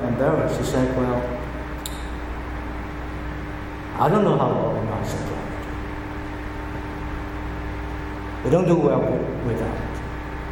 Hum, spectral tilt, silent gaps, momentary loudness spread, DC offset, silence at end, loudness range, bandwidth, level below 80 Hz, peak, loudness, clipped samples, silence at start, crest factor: none; -7 dB/octave; none; 13 LU; under 0.1%; 0 s; 6 LU; 17.5 kHz; -34 dBFS; -6 dBFS; -25 LUFS; under 0.1%; 0 s; 18 dB